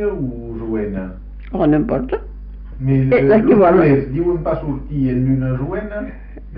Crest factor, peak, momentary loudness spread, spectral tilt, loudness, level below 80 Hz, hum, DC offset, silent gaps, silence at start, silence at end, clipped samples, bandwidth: 14 dB; -2 dBFS; 20 LU; -9 dB/octave; -17 LUFS; -32 dBFS; none; under 0.1%; none; 0 s; 0 s; under 0.1%; 4.9 kHz